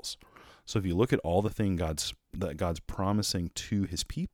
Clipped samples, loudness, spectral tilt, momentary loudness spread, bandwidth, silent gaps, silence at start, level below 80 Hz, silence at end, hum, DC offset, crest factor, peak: under 0.1%; -31 LUFS; -5 dB/octave; 9 LU; 17.5 kHz; none; 0.05 s; -46 dBFS; 0.05 s; none; under 0.1%; 20 dB; -10 dBFS